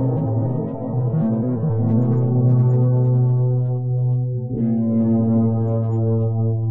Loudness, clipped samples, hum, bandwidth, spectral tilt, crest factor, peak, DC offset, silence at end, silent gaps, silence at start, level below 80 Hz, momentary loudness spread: -19 LUFS; under 0.1%; none; 2 kHz; -14.5 dB/octave; 10 dB; -8 dBFS; under 0.1%; 0 s; none; 0 s; -52 dBFS; 6 LU